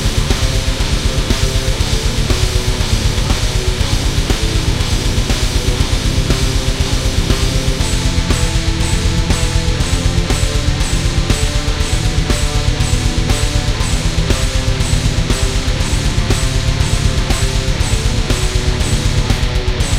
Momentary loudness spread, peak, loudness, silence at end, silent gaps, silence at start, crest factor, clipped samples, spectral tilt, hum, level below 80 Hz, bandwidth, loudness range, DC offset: 1 LU; 0 dBFS; -16 LUFS; 0 s; none; 0 s; 14 dB; under 0.1%; -4 dB/octave; none; -16 dBFS; 16 kHz; 0 LU; under 0.1%